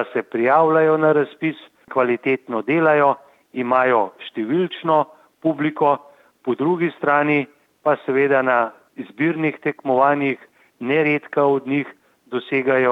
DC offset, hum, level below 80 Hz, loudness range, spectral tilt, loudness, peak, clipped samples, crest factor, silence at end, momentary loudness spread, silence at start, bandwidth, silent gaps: under 0.1%; none; -76 dBFS; 2 LU; -8.5 dB/octave; -19 LUFS; -4 dBFS; under 0.1%; 16 dB; 0 s; 13 LU; 0 s; 5.2 kHz; none